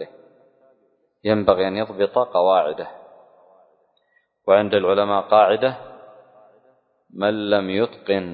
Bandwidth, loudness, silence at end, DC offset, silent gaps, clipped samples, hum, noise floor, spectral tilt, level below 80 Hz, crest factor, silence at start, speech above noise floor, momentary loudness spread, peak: 4.8 kHz; -19 LUFS; 0 s; under 0.1%; none; under 0.1%; none; -65 dBFS; -10 dB/octave; -58 dBFS; 20 dB; 0 s; 46 dB; 14 LU; 0 dBFS